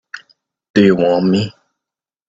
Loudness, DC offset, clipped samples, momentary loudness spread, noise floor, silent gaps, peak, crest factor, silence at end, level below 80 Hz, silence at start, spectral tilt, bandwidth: -14 LUFS; under 0.1%; under 0.1%; 21 LU; -85 dBFS; 0.70-0.74 s; 0 dBFS; 16 dB; 0.8 s; -52 dBFS; 0.15 s; -7 dB/octave; 7.8 kHz